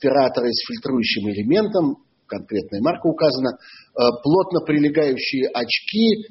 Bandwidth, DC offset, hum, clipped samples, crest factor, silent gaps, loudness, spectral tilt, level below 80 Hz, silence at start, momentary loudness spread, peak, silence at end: 6 kHz; under 0.1%; none; under 0.1%; 16 dB; none; -20 LUFS; -4 dB/octave; -58 dBFS; 0 s; 9 LU; -4 dBFS; 0.05 s